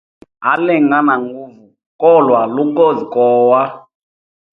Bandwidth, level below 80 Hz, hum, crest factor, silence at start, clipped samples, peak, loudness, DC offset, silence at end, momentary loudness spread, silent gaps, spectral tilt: 4.1 kHz; -64 dBFS; none; 14 dB; 0.4 s; under 0.1%; 0 dBFS; -13 LUFS; under 0.1%; 0.75 s; 10 LU; 1.86-1.99 s; -9 dB/octave